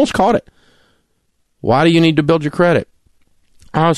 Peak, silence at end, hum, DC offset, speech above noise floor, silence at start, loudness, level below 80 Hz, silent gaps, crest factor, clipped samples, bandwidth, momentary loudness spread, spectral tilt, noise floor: -2 dBFS; 0 s; none; under 0.1%; 51 dB; 0 s; -14 LUFS; -46 dBFS; none; 14 dB; under 0.1%; 12 kHz; 11 LU; -6.5 dB/octave; -64 dBFS